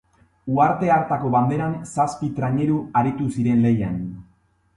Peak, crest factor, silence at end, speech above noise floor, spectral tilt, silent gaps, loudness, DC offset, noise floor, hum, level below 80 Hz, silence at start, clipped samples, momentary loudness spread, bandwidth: -6 dBFS; 16 dB; 0.55 s; 40 dB; -8 dB/octave; none; -21 LUFS; under 0.1%; -60 dBFS; none; -50 dBFS; 0.45 s; under 0.1%; 8 LU; 11.5 kHz